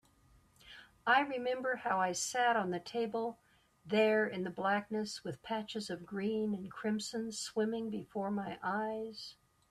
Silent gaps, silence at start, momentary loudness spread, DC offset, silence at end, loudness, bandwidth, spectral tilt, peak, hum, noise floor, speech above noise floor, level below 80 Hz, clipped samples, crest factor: none; 0.65 s; 11 LU; under 0.1%; 0.35 s; -36 LUFS; 13.5 kHz; -4 dB/octave; -16 dBFS; none; -67 dBFS; 31 dB; -74 dBFS; under 0.1%; 20 dB